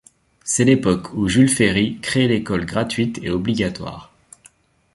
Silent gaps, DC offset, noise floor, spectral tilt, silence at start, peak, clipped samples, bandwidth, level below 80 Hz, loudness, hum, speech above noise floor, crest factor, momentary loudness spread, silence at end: none; under 0.1%; -53 dBFS; -5 dB/octave; 0.45 s; -2 dBFS; under 0.1%; 11.5 kHz; -44 dBFS; -19 LUFS; none; 35 dB; 18 dB; 11 LU; 0.9 s